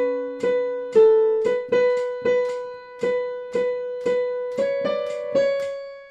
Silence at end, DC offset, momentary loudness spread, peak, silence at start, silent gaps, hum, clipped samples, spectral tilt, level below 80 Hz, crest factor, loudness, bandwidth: 0 s; under 0.1%; 10 LU; -6 dBFS; 0 s; none; none; under 0.1%; -5 dB/octave; -68 dBFS; 16 dB; -22 LUFS; 8.8 kHz